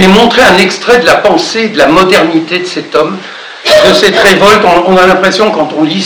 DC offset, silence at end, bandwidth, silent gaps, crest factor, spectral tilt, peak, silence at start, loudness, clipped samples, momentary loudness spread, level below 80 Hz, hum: under 0.1%; 0 s; over 20 kHz; none; 6 dB; -4 dB/octave; 0 dBFS; 0 s; -6 LUFS; 10%; 8 LU; -36 dBFS; none